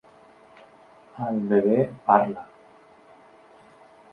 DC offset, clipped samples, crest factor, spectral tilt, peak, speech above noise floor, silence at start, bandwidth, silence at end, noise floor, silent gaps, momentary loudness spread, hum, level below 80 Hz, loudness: under 0.1%; under 0.1%; 24 dB; -9.5 dB/octave; -4 dBFS; 31 dB; 1.15 s; 4.9 kHz; 1.7 s; -53 dBFS; none; 12 LU; none; -70 dBFS; -23 LUFS